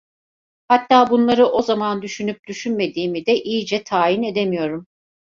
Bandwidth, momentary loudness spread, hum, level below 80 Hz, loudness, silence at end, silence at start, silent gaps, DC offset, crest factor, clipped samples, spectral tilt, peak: 7.6 kHz; 12 LU; none; -60 dBFS; -19 LUFS; 0.45 s; 0.7 s; 2.39-2.43 s; under 0.1%; 18 dB; under 0.1%; -5 dB/octave; -2 dBFS